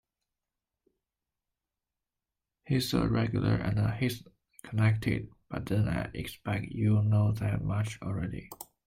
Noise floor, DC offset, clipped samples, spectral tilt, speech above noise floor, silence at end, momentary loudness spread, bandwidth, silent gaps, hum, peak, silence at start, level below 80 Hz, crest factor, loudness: -89 dBFS; under 0.1%; under 0.1%; -7 dB/octave; 60 dB; 0.25 s; 11 LU; 16 kHz; none; none; -12 dBFS; 2.65 s; -50 dBFS; 18 dB; -31 LUFS